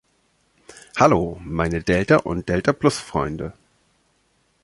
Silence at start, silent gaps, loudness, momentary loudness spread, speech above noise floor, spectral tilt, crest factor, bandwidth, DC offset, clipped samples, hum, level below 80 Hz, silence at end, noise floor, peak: 0.95 s; none; -21 LUFS; 12 LU; 45 dB; -6 dB/octave; 22 dB; 11.5 kHz; under 0.1%; under 0.1%; none; -42 dBFS; 1.1 s; -65 dBFS; -2 dBFS